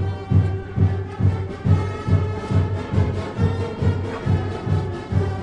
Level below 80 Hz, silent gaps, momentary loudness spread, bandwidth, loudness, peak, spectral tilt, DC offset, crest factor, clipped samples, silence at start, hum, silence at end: -38 dBFS; none; 3 LU; 7.8 kHz; -22 LUFS; -4 dBFS; -8.5 dB/octave; under 0.1%; 16 dB; under 0.1%; 0 s; none; 0 s